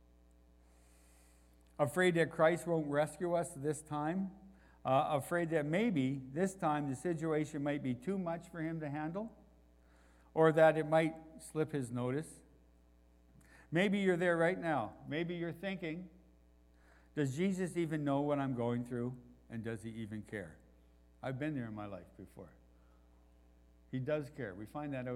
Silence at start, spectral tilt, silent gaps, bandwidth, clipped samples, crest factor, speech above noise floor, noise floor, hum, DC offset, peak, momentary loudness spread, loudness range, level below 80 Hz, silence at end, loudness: 1.8 s; -6.5 dB/octave; none; 15.5 kHz; under 0.1%; 22 dB; 30 dB; -65 dBFS; none; under 0.1%; -14 dBFS; 14 LU; 11 LU; -66 dBFS; 0 s; -36 LUFS